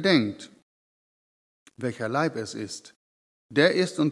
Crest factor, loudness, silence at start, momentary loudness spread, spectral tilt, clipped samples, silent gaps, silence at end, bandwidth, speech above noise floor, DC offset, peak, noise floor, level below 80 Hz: 22 dB; -26 LUFS; 0 s; 17 LU; -5 dB/octave; under 0.1%; 0.63-1.66 s, 2.96-3.49 s; 0 s; 12 kHz; over 65 dB; under 0.1%; -6 dBFS; under -90 dBFS; -78 dBFS